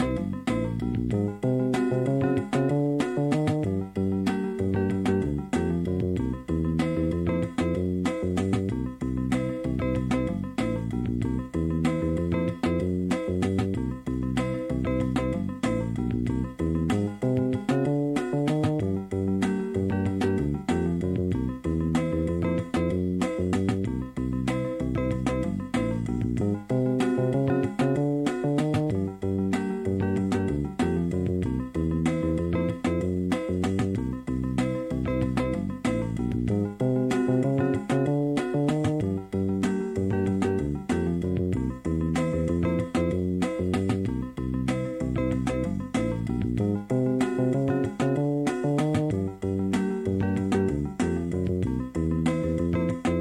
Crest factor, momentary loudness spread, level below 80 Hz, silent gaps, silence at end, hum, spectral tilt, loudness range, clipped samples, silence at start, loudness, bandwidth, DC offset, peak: 14 dB; 4 LU; -42 dBFS; none; 0 s; none; -8 dB/octave; 2 LU; under 0.1%; 0 s; -27 LUFS; 12.5 kHz; under 0.1%; -12 dBFS